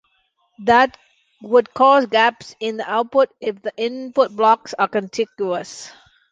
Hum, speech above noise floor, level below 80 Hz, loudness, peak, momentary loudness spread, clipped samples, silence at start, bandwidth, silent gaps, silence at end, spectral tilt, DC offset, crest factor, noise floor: none; 47 dB; -60 dBFS; -18 LUFS; -2 dBFS; 12 LU; under 0.1%; 0.6 s; 9.4 kHz; none; 0.4 s; -4 dB/octave; under 0.1%; 18 dB; -65 dBFS